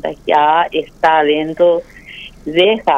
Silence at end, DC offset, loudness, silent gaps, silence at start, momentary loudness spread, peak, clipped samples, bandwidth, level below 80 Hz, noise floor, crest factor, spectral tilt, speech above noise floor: 0 s; under 0.1%; -14 LUFS; none; 0.05 s; 18 LU; 0 dBFS; under 0.1%; 8.6 kHz; -46 dBFS; -35 dBFS; 14 dB; -5.5 dB/octave; 21 dB